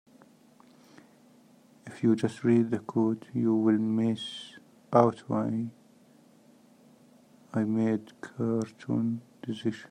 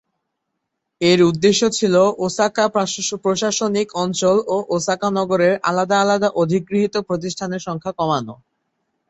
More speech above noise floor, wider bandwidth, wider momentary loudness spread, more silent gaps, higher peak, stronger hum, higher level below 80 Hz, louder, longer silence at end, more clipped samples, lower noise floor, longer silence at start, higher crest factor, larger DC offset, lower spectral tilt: second, 31 dB vs 59 dB; first, 10 kHz vs 8.2 kHz; first, 13 LU vs 8 LU; neither; second, -6 dBFS vs -2 dBFS; neither; second, -76 dBFS vs -58 dBFS; second, -29 LUFS vs -18 LUFS; second, 0.05 s vs 0.75 s; neither; second, -59 dBFS vs -77 dBFS; first, 1.85 s vs 1 s; first, 24 dB vs 16 dB; neither; first, -7.5 dB/octave vs -4.5 dB/octave